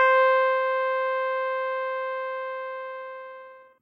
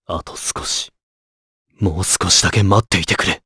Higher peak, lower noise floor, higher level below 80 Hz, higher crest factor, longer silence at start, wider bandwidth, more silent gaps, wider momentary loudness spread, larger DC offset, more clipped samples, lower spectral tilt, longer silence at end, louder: second, -8 dBFS vs 0 dBFS; second, -46 dBFS vs under -90 dBFS; second, -86 dBFS vs -38 dBFS; about the same, 16 dB vs 18 dB; about the same, 0 s vs 0.1 s; second, 5.6 kHz vs 11 kHz; second, none vs 1.03-1.65 s; first, 18 LU vs 11 LU; neither; neither; second, -1 dB/octave vs -3 dB/octave; about the same, 0.2 s vs 0.1 s; second, -25 LUFS vs -16 LUFS